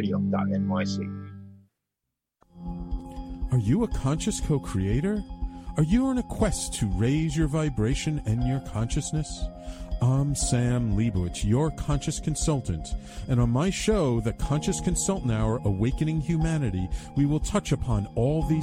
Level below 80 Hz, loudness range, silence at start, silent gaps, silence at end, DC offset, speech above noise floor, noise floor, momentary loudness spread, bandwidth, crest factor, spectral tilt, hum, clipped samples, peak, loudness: -36 dBFS; 4 LU; 0 s; none; 0 s; under 0.1%; 59 dB; -84 dBFS; 12 LU; 15.5 kHz; 18 dB; -6 dB/octave; none; under 0.1%; -8 dBFS; -27 LUFS